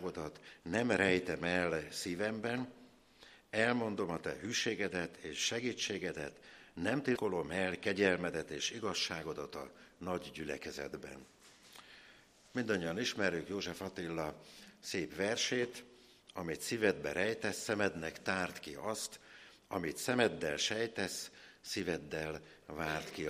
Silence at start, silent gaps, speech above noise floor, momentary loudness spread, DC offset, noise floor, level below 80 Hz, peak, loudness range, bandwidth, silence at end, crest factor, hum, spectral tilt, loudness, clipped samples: 0 s; none; 25 dB; 16 LU; under 0.1%; -63 dBFS; -66 dBFS; -16 dBFS; 4 LU; 15 kHz; 0 s; 22 dB; none; -3.5 dB/octave; -37 LUFS; under 0.1%